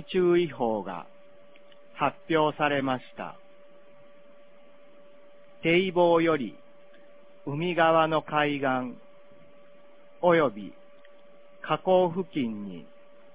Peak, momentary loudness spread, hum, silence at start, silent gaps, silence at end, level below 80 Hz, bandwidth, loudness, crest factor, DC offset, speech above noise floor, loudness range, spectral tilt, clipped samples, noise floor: -8 dBFS; 19 LU; none; 0 s; none; 0.55 s; -66 dBFS; 4 kHz; -26 LUFS; 20 dB; 0.4%; 30 dB; 5 LU; -9.5 dB/octave; under 0.1%; -56 dBFS